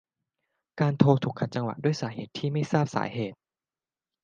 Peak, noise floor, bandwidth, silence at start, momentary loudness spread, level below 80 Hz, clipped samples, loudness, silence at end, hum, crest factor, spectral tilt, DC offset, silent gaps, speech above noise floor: -4 dBFS; under -90 dBFS; 7.4 kHz; 0.75 s; 12 LU; -68 dBFS; under 0.1%; -27 LUFS; 0.9 s; none; 24 dB; -7.5 dB/octave; under 0.1%; none; over 64 dB